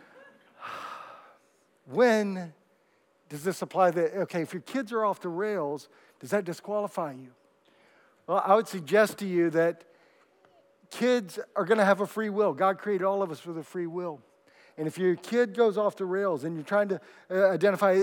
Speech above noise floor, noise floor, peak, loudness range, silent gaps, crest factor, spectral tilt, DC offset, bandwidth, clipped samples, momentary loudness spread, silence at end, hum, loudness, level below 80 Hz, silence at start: 40 dB; -67 dBFS; -8 dBFS; 4 LU; none; 22 dB; -6 dB/octave; under 0.1%; 18 kHz; under 0.1%; 16 LU; 0 s; none; -28 LUFS; under -90 dBFS; 0.6 s